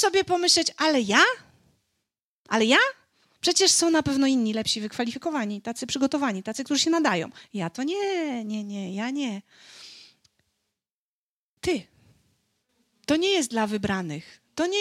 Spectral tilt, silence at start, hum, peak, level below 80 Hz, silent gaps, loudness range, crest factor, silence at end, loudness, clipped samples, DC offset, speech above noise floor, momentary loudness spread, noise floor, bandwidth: -2.5 dB/octave; 0 s; none; -4 dBFS; -62 dBFS; 2.24-2.45 s, 10.91-11.57 s; 13 LU; 22 dB; 0 s; -24 LUFS; under 0.1%; under 0.1%; over 66 dB; 14 LU; under -90 dBFS; 16 kHz